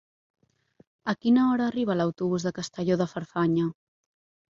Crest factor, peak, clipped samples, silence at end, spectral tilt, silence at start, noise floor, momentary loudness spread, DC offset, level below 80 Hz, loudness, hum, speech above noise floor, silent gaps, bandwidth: 16 dB; -12 dBFS; under 0.1%; 0.8 s; -6.5 dB/octave; 1.05 s; -62 dBFS; 10 LU; under 0.1%; -68 dBFS; -26 LUFS; none; 37 dB; none; 7.6 kHz